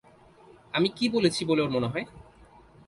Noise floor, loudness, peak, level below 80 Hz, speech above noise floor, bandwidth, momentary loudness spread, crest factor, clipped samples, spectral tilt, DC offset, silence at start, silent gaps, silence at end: -55 dBFS; -27 LUFS; -10 dBFS; -60 dBFS; 29 dB; 11.5 kHz; 9 LU; 20 dB; under 0.1%; -5 dB/octave; under 0.1%; 0.75 s; none; 0.65 s